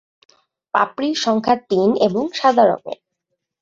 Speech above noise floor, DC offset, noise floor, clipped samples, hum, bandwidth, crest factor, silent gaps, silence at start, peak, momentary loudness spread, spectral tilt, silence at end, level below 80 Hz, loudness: 60 dB; under 0.1%; -77 dBFS; under 0.1%; none; 7.8 kHz; 18 dB; none; 0.75 s; -2 dBFS; 10 LU; -5 dB/octave; 0.65 s; -62 dBFS; -18 LUFS